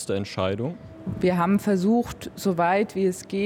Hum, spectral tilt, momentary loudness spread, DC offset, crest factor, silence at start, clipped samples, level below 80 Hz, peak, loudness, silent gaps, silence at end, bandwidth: none; -6.5 dB/octave; 11 LU; under 0.1%; 14 dB; 0 s; under 0.1%; -54 dBFS; -10 dBFS; -24 LUFS; none; 0 s; 16.5 kHz